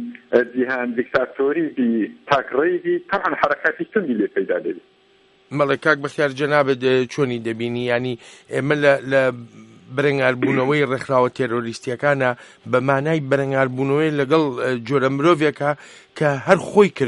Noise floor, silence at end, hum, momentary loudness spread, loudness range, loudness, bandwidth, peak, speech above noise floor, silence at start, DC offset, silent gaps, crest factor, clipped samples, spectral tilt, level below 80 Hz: -56 dBFS; 0 s; none; 8 LU; 2 LU; -20 LUFS; 11.5 kHz; 0 dBFS; 36 dB; 0 s; under 0.1%; none; 20 dB; under 0.1%; -6.5 dB/octave; -62 dBFS